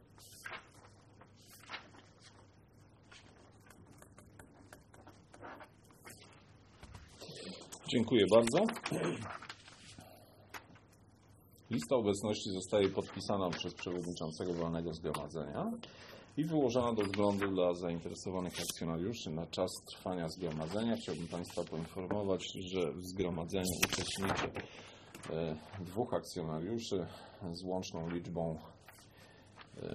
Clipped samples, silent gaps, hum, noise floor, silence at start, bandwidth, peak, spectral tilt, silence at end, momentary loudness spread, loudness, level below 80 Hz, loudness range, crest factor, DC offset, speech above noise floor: under 0.1%; none; none; -63 dBFS; 0.15 s; 13 kHz; -12 dBFS; -5 dB/octave; 0 s; 24 LU; -37 LUFS; -64 dBFS; 21 LU; 26 dB; under 0.1%; 27 dB